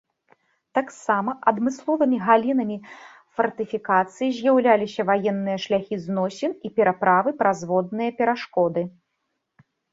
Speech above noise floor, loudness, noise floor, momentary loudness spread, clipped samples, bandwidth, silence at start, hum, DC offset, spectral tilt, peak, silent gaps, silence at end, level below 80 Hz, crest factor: 55 dB; -22 LUFS; -77 dBFS; 9 LU; under 0.1%; 8 kHz; 0.75 s; none; under 0.1%; -6 dB/octave; -2 dBFS; none; 1.05 s; -68 dBFS; 20 dB